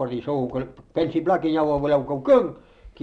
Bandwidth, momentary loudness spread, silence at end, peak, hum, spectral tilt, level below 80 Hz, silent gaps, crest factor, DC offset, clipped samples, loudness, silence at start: 6.8 kHz; 11 LU; 0.15 s; -6 dBFS; none; -8.5 dB/octave; -50 dBFS; none; 16 dB; under 0.1%; under 0.1%; -23 LUFS; 0 s